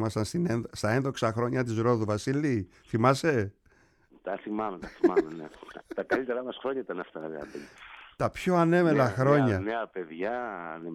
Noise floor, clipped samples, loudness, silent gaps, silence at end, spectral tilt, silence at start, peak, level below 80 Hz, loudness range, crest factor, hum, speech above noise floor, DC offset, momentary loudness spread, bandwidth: -63 dBFS; under 0.1%; -28 LUFS; none; 0 s; -7 dB/octave; 0 s; -8 dBFS; -60 dBFS; 5 LU; 22 dB; none; 35 dB; under 0.1%; 16 LU; 13.5 kHz